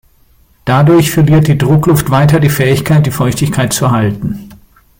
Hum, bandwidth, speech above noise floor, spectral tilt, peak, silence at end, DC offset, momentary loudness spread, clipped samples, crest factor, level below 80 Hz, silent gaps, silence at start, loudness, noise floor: none; 17 kHz; 39 dB; -6 dB/octave; 0 dBFS; 0.45 s; under 0.1%; 8 LU; under 0.1%; 10 dB; -36 dBFS; none; 0.65 s; -10 LUFS; -48 dBFS